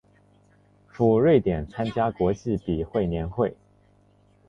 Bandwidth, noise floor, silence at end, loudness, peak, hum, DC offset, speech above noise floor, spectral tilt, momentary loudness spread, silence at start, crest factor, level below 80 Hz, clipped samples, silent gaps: 7.2 kHz; -60 dBFS; 0.95 s; -24 LUFS; -6 dBFS; 50 Hz at -50 dBFS; under 0.1%; 36 dB; -9 dB/octave; 9 LU; 1 s; 18 dB; -44 dBFS; under 0.1%; none